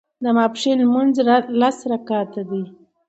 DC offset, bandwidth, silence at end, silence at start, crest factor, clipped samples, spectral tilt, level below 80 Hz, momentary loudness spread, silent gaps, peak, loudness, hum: under 0.1%; 8.2 kHz; 0.4 s; 0.2 s; 16 dB; under 0.1%; -5.5 dB/octave; -70 dBFS; 11 LU; none; -2 dBFS; -19 LUFS; none